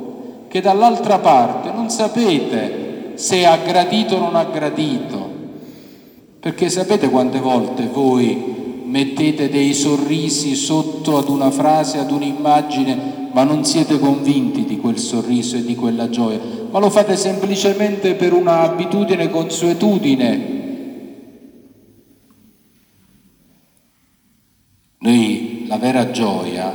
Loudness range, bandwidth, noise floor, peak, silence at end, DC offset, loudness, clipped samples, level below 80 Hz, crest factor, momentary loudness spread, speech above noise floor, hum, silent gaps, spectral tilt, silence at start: 5 LU; over 20 kHz; -58 dBFS; 0 dBFS; 0 s; under 0.1%; -16 LUFS; under 0.1%; -66 dBFS; 16 dB; 11 LU; 43 dB; none; none; -5 dB/octave; 0 s